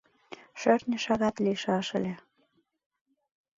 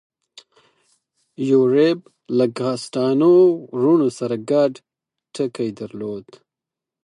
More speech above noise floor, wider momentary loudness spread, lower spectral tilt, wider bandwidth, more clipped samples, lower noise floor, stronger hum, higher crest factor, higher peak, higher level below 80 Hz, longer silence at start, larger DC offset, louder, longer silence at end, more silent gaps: second, 44 dB vs 69 dB; first, 20 LU vs 15 LU; second, -5.5 dB/octave vs -7 dB/octave; second, 7.8 kHz vs 11 kHz; neither; second, -71 dBFS vs -87 dBFS; neither; about the same, 20 dB vs 16 dB; second, -10 dBFS vs -4 dBFS; about the same, -66 dBFS vs -70 dBFS; second, 0.3 s vs 1.4 s; neither; second, -29 LUFS vs -19 LUFS; first, 1.4 s vs 0.85 s; neither